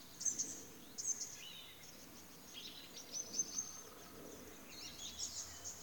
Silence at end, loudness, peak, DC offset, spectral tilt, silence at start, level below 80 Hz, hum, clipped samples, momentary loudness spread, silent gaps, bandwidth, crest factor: 0 s; -45 LUFS; -26 dBFS; under 0.1%; -0.5 dB/octave; 0 s; -74 dBFS; none; under 0.1%; 14 LU; none; over 20 kHz; 22 dB